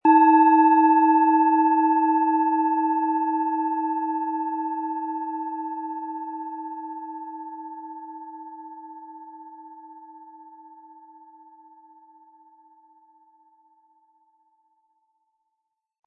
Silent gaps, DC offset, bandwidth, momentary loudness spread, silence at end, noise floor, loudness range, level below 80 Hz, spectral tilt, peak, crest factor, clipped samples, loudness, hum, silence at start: none; under 0.1%; 4 kHz; 25 LU; 5.6 s; -81 dBFS; 25 LU; -90 dBFS; -8 dB/octave; -6 dBFS; 18 dB; under 0.1%; -21 LUFS; none; 0.05 s